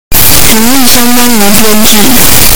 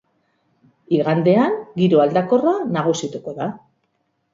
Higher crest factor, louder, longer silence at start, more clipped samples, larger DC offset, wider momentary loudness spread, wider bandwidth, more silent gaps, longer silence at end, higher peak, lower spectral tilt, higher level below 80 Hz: second, 8 dB vs 18 dB; first, -3 LUFS vs -19 LUFS; second, 0.1 s vs 0.9 s; first, 50% vs under 0.1%; first, 60% vs under 0.1%; second, 2 LU vs 12 LU; first, over 20 kHz vs 7.8 kHz; neither; second, 0 s vs 0.75 s; about the same, 0 dBFS vs -2 dBFS; second, -2.5 dB/octave vs -7 dB/octave; first, -20 dBFS vs -64 dBFS